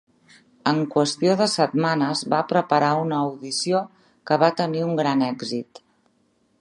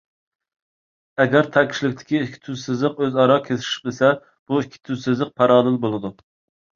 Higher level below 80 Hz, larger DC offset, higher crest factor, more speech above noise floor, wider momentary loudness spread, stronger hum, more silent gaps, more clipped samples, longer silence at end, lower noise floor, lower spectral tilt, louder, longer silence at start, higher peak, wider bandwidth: second, -72 dBFS vs -62 dBFS; neither; about the same, 20 dB vs 20 dB; second, 43 dB vs over 70 dB; second, 7 LU vs 12 LU; neither; second, none vs 4.39-4.46 s; neither; first, 1 s vs 0.65 s; second, -65 dBFS vs under -90 dBFS; about the same, -5 dB/octave vs -6 dB/octave; about the same, -22 LUFS vs -20 LUFS; second, 0.65 s vs 1.2 s; about the same, -2 dBFS vs 0 dBFS; first, 11.5 kHz vs 7.4 kHz